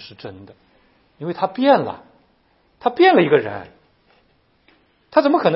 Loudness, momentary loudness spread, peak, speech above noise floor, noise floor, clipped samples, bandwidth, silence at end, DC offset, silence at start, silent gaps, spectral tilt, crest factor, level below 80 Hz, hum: -17 LUFS; 23 LU; 0 dBFS; 43 dB; -60 dBFS; under 0.1%; 5.8 kHz; 0 s; under 0.1%; 0 s; none; -10.5 dB/octave; 20 dB; -64 dBFS; none